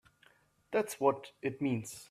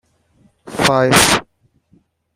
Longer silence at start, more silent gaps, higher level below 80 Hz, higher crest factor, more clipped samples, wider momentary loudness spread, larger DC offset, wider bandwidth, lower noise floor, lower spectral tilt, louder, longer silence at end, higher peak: about the same, 0.7 s vs 0.65 s; neither; second, -76 dBFS vs -44 dBFS; about the same, 22 dB vs 18 dB; neither; about the same, 7 LU vs 9 LU; neither; about the same, 15.5 kHz vs 16 kHz; first, -67 dBFS vs -57 dBFS; first, -5.5 dB/octave vs -3 dB/octave; second, -35 LUFS vs -13 LUFS; second, 0.05 s vs 0.95 s; second, -14 dBFS vs 0 dBFS